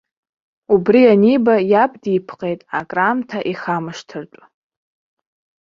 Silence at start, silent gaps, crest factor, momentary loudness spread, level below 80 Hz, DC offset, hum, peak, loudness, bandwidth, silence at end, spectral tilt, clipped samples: 0.7 s; none; 16 dB; 15 LU; -60 dBFS; under 0.1%; none; -2 dBFS; -16 LUFS; 7.4 kHz; 1.35 s; -7.5 dB/octave; under 0.1%